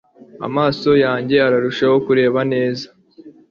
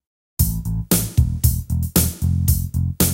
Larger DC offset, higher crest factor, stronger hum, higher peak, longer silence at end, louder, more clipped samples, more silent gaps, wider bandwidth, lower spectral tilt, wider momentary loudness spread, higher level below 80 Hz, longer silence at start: neither; about the same, 14 dB vs 18 dB; neither; about the same, -2 dBFS vs 0 dBFS; first, 0.2 s vs 0 s; first, -16 LUFS vs -20 LUFS; neither; neither; second, 7.2 kHz vs 17 kHz; first, -7 dB/octave vs -5 dB/octave; first, 10 LU vs 5 LU; second, -54 dBFS vs -26 dBFS; about the same, 0.35 s vs 0.4 s